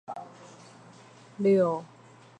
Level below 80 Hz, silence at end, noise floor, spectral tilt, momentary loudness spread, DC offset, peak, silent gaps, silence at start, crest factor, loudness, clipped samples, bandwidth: -80 dBFS; 0.55 s; -52 dBFS; -8 dB/octave; 26 LU; under 0.1%; -12 dBFS; none; 0.1 s; 18 dB; -26 LUFS; under 0.1%; 9.2 kHz